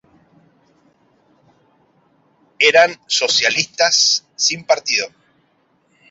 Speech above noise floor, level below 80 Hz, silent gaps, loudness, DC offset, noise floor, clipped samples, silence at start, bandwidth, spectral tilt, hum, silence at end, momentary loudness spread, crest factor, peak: 45 dB; -68 dBFS; none; -14 LUFS; under 0.1%; -61 dBFS; under 0.1%; 2.6 s; 8 kHz; 0.5 dB/octave; none; 1 s; 7 LU; 20 dB; 0 dBFS